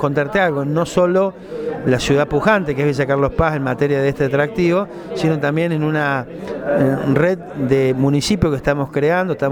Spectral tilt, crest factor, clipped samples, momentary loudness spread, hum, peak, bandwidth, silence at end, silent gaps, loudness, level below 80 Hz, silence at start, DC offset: -6.5 dB/octave; 16 dB; under 0.1%; 5 LU; none; 0 dBFS; 16.5 kHz; 0 s; none; -17 LUFS; -38 dBFS; 0 s; under 0.1%